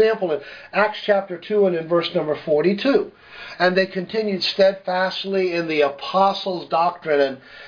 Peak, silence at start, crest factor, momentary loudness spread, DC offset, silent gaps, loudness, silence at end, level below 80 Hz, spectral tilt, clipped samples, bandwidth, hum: -4 dBFS; 0 s; 18 dB; 6 LU; under 0.1%; none; -20 LUFS; 0 s; -66 dBFS; -6 dB/octave; under 0.1%; 5.4 kHz; none